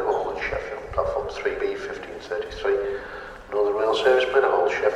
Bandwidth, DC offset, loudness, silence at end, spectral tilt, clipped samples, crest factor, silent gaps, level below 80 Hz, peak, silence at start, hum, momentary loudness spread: 9.4 kHz; under 0.1%; -24 LUFS; 0 s; -4.5 dB/octave; under 0.1%; 18 dB; none; -46 dBFS; -6 dBFS; 0 s; none; 13 LU